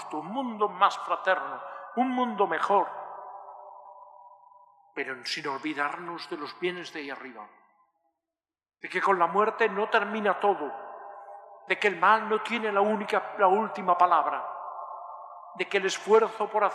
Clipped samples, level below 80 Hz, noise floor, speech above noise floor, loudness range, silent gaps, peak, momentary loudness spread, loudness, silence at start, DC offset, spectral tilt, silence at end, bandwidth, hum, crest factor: under 0.1%; under -90 dBFS; under -90 dBFS; over 63 dB; 10 LU; none; -8 dBFS; 20 LU; -27 LUFS; 0 s; under 0.1%; -4 dB/octave; 0 s; 12 kHz; none; 22 dB